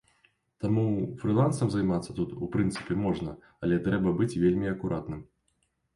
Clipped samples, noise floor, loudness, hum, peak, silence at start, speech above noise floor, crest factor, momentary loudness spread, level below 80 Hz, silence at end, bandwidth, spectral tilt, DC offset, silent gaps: under 0.1%; -74 dBFS; -29 LUFS; none; -14 dBFS; 0.6 s; 47 dB; 16 dB; 9 LU; -52 dBFS; 0.7 s; 11.5 kHz; -7.5 dB/octave; under 0.1%; none